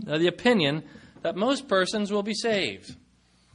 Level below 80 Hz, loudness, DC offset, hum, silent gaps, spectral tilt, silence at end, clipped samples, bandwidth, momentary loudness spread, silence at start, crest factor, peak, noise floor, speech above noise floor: -64 dBFS; -26 LUFS; under 0.1%; none; none; -4.5 dB/octave; 0.6 s; under 0.1%; 10.5 kHz; 11 LU; 0 s; 16 dB; -10 dBFS; -62 dBFS; 36 dB